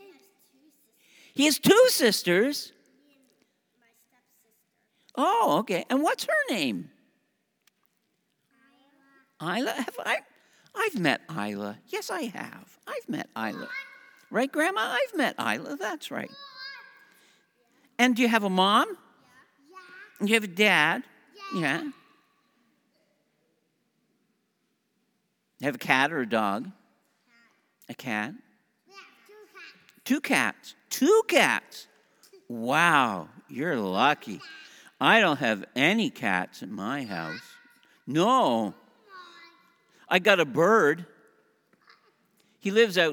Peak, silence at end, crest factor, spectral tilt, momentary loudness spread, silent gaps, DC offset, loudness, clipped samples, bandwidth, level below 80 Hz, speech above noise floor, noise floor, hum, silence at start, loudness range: -4 dBFS; 0 s; 26 dB; -3.5 dB/octave; 20 LU; none; under 0.1%; -25 LUFS; under 0.1%; over 20 kHz; -82 dBFS; 50 dB; -75 dBFS; none; 1.35 s; 10 LU